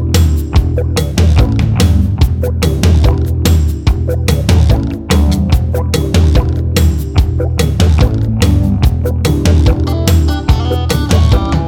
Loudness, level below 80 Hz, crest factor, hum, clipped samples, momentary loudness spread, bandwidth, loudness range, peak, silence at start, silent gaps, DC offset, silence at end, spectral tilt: -12 LUFS; -14 dBFS; 10 dB; none; under 0.1%; 4 LU; 17 kHz; 1 LU; 0 dBFS; 0 s; none; under 0.1%; 0 s; -6.5 dB/octave